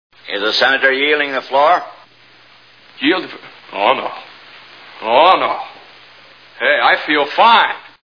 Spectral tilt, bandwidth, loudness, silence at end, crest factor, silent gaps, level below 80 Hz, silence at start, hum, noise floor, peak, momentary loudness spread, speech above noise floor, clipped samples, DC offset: -3.5 dB/octave; 5.4 kHz; -14 LUFS; 0.25 s; 16 dB; none; -70 dBFS; 0.25 s; none; -46 dBFS; 0 dBFS; 17 LU; 33 dB; under 0.1%; 0.2%